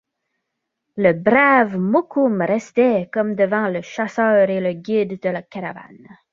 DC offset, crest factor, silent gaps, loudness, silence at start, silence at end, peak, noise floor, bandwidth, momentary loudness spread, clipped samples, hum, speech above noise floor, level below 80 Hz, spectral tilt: under 0.1%; 18 dB; none; -18 LUFS; 0.95 s; 0.45 s; 0 dBFS; -78 dBFS; 7.6 kHz; 13 LU; under 0.1%; none; 60 dB; -62 dBFS; -7.5 dB/octave